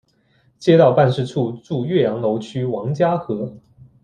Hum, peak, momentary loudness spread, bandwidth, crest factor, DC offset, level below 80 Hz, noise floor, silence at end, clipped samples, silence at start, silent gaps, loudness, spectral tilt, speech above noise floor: none; -2 dBFS; 12 LU; 9.6 kHz; 18 dB; under 0.1%; -58 dBFS; -59 dBFS; 0.45 s; under 0.1%; 0.6 s; none; -19 LUFS; -8 dB/octave; 42 dB